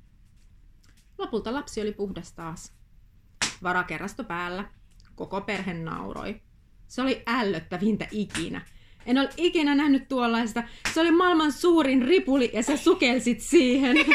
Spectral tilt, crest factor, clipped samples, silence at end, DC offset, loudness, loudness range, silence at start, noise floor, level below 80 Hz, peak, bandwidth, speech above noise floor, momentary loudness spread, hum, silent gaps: -4 dB/octave; 20 dB; under 0.1%; 0 s; under 0.1%; -25 LUFS; 11 LU; 1.2 s; -55 dBFS; -52 dBFS; -6 dBFS; 14.5 kHz; 30 dB; 17 LU; none; none